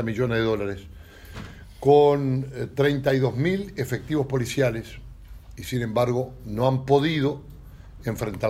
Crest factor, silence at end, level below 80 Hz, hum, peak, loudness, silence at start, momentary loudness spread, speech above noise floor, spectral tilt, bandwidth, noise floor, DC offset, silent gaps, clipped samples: 20 dB; 0 s; -46 dBFS; none; -4 dBFS; -24 LUFS; 0 s; 19 LU; 20 dB; -6.5 dB/octave; 15.5 kHz; -43 dBFS; under 0.1%; none; under 0.1%